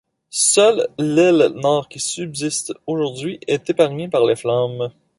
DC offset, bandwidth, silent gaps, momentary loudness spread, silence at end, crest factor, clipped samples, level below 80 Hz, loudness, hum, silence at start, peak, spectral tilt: under 0.1%; 11.5 kHz; none; 10 LU; 0.3 s; 16 dB; under 0.1%; -62 dBFS; -18 LUFS; none; 0.35 s; -2 dBFS; -4 dB/octave